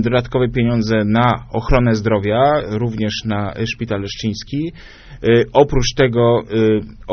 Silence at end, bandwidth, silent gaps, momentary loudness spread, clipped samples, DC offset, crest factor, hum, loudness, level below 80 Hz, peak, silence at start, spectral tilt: 0 s; 6.6 kHz; none; 9 LU; under 0.1%; under 0.1%; 16 dB; none; -17 LUFS; -30 dBFS; 0 dBFS; 0 s; -5.5 dB/octave